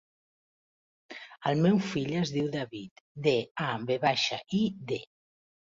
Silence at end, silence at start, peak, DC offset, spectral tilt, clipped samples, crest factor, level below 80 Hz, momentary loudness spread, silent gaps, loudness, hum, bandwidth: 0.75 s; 1.1 s; -12 dBFS; under 0.1%; -5.5 dB/octave; under 0.1%; 18 dB; -68 dBFS; 18 LU; 2.91-3.15 s, 3.51-3.55 s; -30 LUFS; none; 7.6 kHz